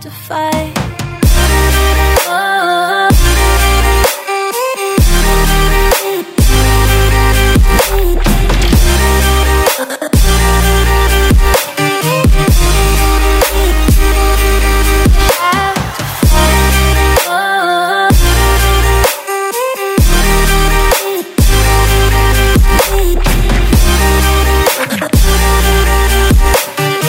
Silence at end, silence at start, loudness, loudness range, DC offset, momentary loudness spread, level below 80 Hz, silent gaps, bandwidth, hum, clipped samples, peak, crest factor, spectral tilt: 0 s; 0 s; -11 LUFS; 1 LU; under 0.1%; 5 LU; -12 dBFS; none; 16.5 kHz; none; under 0.1%; 0 dBFS; 10 dB; -4 dB/octave